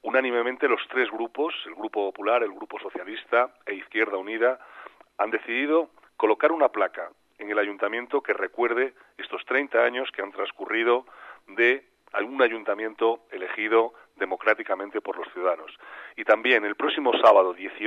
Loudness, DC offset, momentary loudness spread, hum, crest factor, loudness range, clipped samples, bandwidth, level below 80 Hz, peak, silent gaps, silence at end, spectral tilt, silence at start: -25 LUFS; under 0.1%; 13 LU; none; 20 dB; 2 LU; under 0.1%; 7 kHz; -80 dBFS; -6 dBFS; none; 0 s; -4 dB/octave; 0.05 s